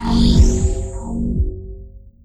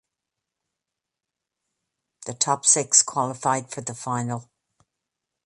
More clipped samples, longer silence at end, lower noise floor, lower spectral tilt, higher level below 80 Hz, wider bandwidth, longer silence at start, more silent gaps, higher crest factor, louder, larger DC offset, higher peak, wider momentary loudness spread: neither; second, 0.15 s vs 1.05 s; second, -38 dBFS vs -86 dBFS; first, -6.5 dB/octave vs -2 dB/octave; first, -18 dBFS vs -70 dBFS; second, 10 kHz vs 11.5 kHz; second, 0 s vs 2.2 s; neither; second, 14 dB vs 26 dB; first, -18 LUFS vs -21 LUFS; neither; about the same, -2 dBFS vs -2 dBFS; first, 21 LU vs 18 LU